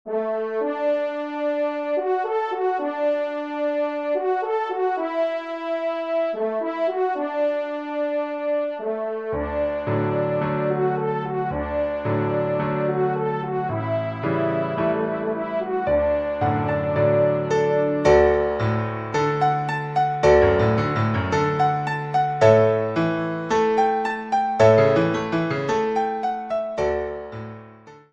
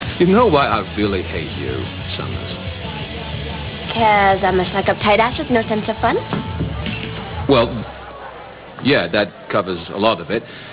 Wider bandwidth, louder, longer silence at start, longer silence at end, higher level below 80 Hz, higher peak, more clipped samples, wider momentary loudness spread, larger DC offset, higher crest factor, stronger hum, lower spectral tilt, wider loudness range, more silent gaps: first, 8 kHz vs 4 kHz; second, -22 LUFS vs -18 LUFS; about the same, 0.05 s vs 0 s; first, 0.15 s vs 0 s; second, -46 dBFS vs -36 dBFS; about the same, -2 dBFS vs 0 dBFS; neither; second, 9 LU vs 13 LU; neither; about the same, 20 dB vs 18 dB; neither; second, -7.5 dB/octave vs -10 dB/octave; about the same, 5 LU vs 4 LU; neither